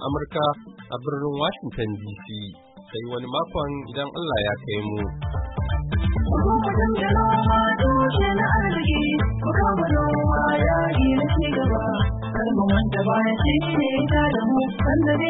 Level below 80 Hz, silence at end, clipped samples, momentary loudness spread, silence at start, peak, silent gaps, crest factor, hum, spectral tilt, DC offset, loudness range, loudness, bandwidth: -30 dBFS; 0 s; under 0.1%; 10 LU; 0 s; -8 dBFS; none; 14 dB; none; -11.5 dB/octave; under 0.1%; 8 LU; -22 LUFS; 4.1 kHz